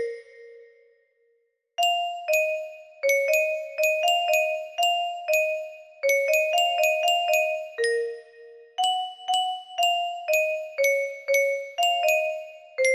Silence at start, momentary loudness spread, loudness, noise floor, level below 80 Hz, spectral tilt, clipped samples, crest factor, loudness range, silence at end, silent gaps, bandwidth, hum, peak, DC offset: 0 s; 11 LU; -24 LUFS; -70 dBFS; -80 dBFS; 2.5 dB/octave; under 0.1%; 16 dB; 3 LU; 0 s; none; 15.5 kHz; none; -10 dBFS; under 0.1%